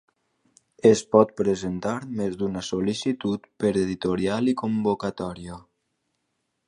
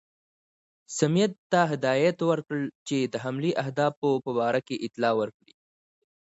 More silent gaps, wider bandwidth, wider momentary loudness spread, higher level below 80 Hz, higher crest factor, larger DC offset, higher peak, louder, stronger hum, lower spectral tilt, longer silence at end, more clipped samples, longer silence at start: second, none vs 1.38-1.50 s, 2.75-2.86 s, 3.97-4.02 s; first, 11 kHz vs 8 kHz; first, 11 LU vs 7 LU; first, -56 dBFS vs -74 dBFS; about the same, 24 dB vs 20 dB; neither; first, -2 dBFS vs -8 dBFS; first, -24 LUFS vs -27 LUFS; neither; about the same, -6 dB/octave vs -5.5 dB/octave; first, 1.05 s vs 0.9 s; neither; about the same, 0.85 s vs 0.9 s